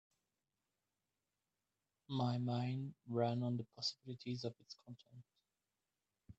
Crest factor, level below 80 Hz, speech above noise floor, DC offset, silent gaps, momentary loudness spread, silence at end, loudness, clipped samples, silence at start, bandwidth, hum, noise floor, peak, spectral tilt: 20 dB; -80 dBFS; over 48 dB; under 0.1%; none; 17 LU; 0.05 s; -42 LUFS; under 0.1%; 2.1 s; 8 kHz; none; under -90 dBFS; -24 dBFS; -7 dB/octave